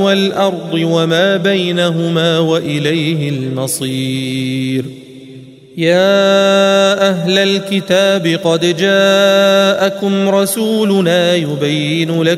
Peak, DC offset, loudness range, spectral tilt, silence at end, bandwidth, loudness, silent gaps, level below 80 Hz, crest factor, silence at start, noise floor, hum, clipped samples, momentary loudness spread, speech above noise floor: 0 dBFS; under 0.1%; 5 LU; -5 dB/octave; 0 s; 16 kHz; -13 LUFS; none; -60 dBFS; 12 dB; 0 s; -35 dBFS; none; under 0.1%; 8 LU; 23 dB